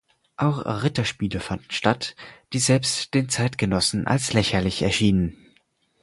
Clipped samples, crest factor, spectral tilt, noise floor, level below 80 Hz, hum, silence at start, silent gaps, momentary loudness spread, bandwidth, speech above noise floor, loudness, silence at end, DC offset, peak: under 0.1%; 22 dB; -4.5 dB/octave; -64 dBFS; -44 dBFS; none; 0.4 s; none; 8 LU; 11.5 kHz; 41 dB; -23 LUFS; 0.7 s; under 0.1%; -2 dBFS